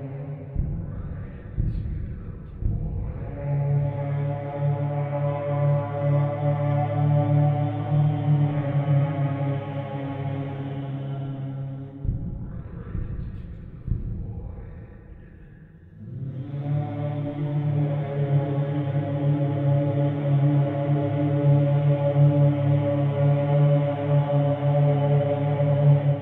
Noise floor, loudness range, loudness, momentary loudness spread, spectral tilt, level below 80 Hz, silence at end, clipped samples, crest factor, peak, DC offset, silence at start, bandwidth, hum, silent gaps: -46 dBFS; 12 LU; -24 LUFS; 14 LU; -12 dB/octave; -40 dBFS; 0 s; under 0.1%; 16 dB; -8 dBFS; under 0.1%; 0 s; 3.7 kHz; none; none